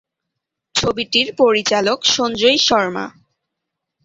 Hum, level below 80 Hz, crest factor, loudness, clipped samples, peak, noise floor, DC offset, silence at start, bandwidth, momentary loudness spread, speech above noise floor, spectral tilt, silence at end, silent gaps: none; -52 dBFS; 18 dB; -15 LUFS; under 0.1%; -2 dBFS; -80 dBFS; under 0.1%; 0.75 s; 8 kHz; 9 LU; 63 dB; -2.5 dB/octave; 0.95 s; none